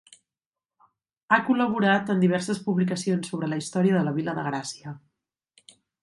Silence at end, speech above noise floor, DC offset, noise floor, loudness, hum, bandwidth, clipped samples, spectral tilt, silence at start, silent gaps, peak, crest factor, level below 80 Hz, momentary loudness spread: 1.05 s; over 66 dB; under 0.1%; under -90 dBFS; -25 LUFS; none; 11.5 kHz; under 0.1%; -6 dB/octave; 1.3 s; none; -4 dBFS; 22 dB; -70 dBFS; 11 LU